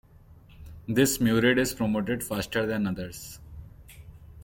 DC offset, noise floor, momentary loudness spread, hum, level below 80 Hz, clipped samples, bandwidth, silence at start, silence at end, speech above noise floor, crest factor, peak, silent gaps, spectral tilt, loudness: under 0.1%; -53 dBFS; 21 LU; none; -50 dBFS; under 0.1%; 17 kHz; 0.3 s; 0 s; 27 dB; 20 dB; -8 dBFS; none; -4.5 dB/octave; -26 LUFS